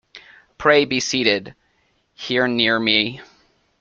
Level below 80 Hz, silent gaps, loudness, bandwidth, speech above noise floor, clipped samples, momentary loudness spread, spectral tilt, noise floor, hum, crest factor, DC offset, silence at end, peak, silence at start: -58 dBFS; none; -18 LUFS; 8.6 kHz; 45 dB; under 0.1%; 9 LU; -3 dB/octave; -64 dBFS; none; 20 dB; under 0.1%; 0.55 s; -2 dBFS; 0.15 s